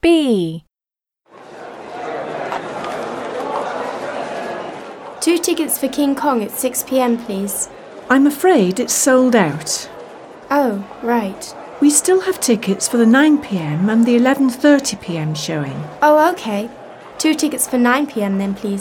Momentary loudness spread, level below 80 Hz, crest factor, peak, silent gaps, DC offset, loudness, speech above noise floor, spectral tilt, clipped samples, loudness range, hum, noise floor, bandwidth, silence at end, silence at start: 17 LU; -54 dBFS; 16 dB; -2 dBFS; none; under 0.1%; -17 LUFS; over 75 dB; -4 dB/octave; under 0.1%; 10 LU; none; under -90 dBFS; 18 kHz; 0 s; 0.05 s